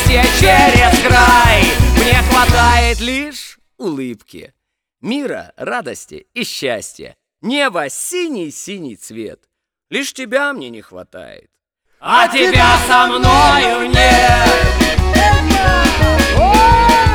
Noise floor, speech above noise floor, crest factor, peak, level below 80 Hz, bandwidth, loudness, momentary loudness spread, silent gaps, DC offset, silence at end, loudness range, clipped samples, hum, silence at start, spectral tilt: -59 dBFS; 45 dB; 12 dB; 0 dBFS; -20 dBFS; over 20 kHz; -11 LUFS; 19 LU; none; under 0.1%; 0 s; 14 LU; under 0.1%; none; 0 s; -4 dB/octave